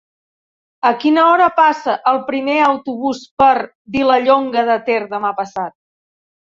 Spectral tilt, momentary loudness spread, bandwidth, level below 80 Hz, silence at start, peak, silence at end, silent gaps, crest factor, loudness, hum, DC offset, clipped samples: -5 dB/octave; 11 LU; 7.6 kHz; -56 dBFS; 0.85 s; -2 dBFS; 0.8 s; 3.31-3.37 s, 3.75-3.85 s; 14 dB; -15 LUFS; none; under 0.1%; under 0.1%